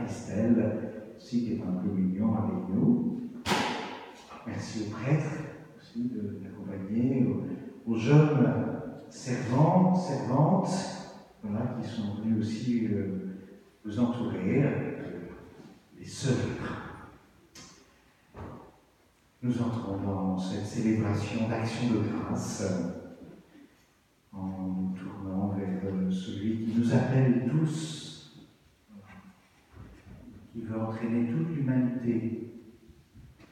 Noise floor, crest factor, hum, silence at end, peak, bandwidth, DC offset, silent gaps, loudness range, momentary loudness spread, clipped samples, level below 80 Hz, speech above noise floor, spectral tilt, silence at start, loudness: -65 dBFS; 22 dB; none; 0.2 s; -8 dBFS; 12 kHz; under 0.1%; none; 10 LU; 19 LU; under 0.1%; -62 dBFS; 37 dB; -7 dB/octave; 0 s; -30 LUFS